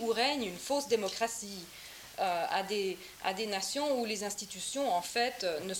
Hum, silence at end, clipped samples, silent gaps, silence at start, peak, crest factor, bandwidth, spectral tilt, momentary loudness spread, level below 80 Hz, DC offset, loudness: none; 0 s; under 0.1%; none; 0 s; -16 dBFS; 18 dB; 17 kHz; -2 dB/octave; 8 LU; -70 dBFS; under 0.1%; -34 LUFS